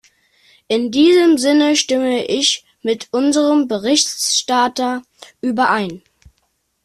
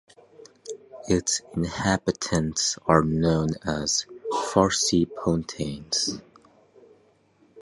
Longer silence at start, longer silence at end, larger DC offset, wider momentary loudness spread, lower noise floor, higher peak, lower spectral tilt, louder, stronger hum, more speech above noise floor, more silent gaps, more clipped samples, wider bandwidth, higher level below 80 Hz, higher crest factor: about the same, 0.7 s vs 0.65 s; first, 0.85 s vs 0 s; neither; second, 10 LU vs 13 LU; first, -66 dBFS vs -61 dBFS; about the same, -2 dBFS vs -4 dBFS; second, -2.5 dB/octave vs -4 dB/octave; first, -15 LUFS vs -24 LUFS; neither; first, 51 dB vs 37 dB; neither; neither; first, 13.5 kHz vs 11.5 kHz; second, -60 dBFS vs -46 dBFS; second, 16 dB vs 24 dB